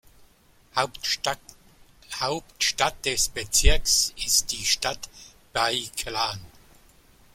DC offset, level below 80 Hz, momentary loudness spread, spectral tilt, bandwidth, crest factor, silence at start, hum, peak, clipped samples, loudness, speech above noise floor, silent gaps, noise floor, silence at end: under 0.1%; -34 dBFS; 11 LU; -1 dB/octave; 16.5 kHz; 24 dB; 0.75 s; none; -4 dBFS; under 0.1%; -24 LUFS; 33 dB; none; -58 dBFS; 0.85 s